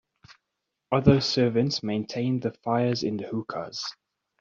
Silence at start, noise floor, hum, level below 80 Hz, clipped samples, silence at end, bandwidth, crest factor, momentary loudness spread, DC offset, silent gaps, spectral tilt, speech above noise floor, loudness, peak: 0.3 s; -83 dBFS; none; -56 dBFS; under 0.1%; 0.5 s; 7.6 kHz; 22 dB; 12 LU; under 0.1%; none; -6 dB/octave; 57 dB; -26 LUFS; -4 dBFS